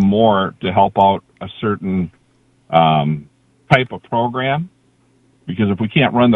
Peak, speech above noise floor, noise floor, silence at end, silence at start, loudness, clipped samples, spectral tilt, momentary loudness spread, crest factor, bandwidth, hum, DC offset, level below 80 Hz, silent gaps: 0 dBFS; 41 dB; -56 dBFS; 0 s; 0 s; -17 LUFS; under 0.1%; -8.5 dB/octave; 13 LU; 16 dB; 6.8 kHz; none; under 0.1%; -46 dBFS; none